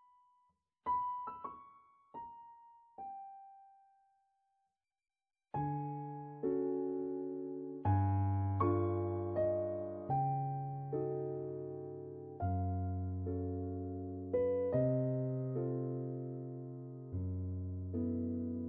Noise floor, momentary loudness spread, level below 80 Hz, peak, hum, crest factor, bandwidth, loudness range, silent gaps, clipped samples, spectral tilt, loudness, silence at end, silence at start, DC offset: -86 dBFS; 15 LU; -64 dBFS; -22 dBFS; none; 16 dB; 2.7 kHz; 14 LU; none; under 0.1%; -11.5 dB/octave; -39 LUFS; 0 s; 0.85 s; under 0.1%